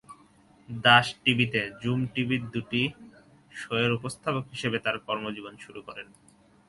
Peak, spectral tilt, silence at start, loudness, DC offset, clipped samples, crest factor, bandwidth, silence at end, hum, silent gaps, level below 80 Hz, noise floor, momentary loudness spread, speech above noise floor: -4 dBFS; -5 dB/octave; 0.1 s; -26 LUFS; under 0.1%; under 0.1%; 26 dB; 11.5 kHz; 0.65 s; none; none; -62 dBFS; -58 dBFS; 22 LU; 31 dB